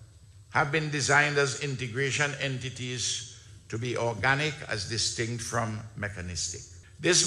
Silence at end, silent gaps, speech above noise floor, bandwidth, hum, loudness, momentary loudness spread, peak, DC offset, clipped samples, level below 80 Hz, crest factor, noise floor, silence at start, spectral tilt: 0 s; none; 23 dB; 12.5 kHz; none; -28 LUFS; 12 LU; -8 dBFS; under 0.1%; under 0.1%; -58 dBFS; 22 dB; -52 dBFS; 0 s; -3 dB/octave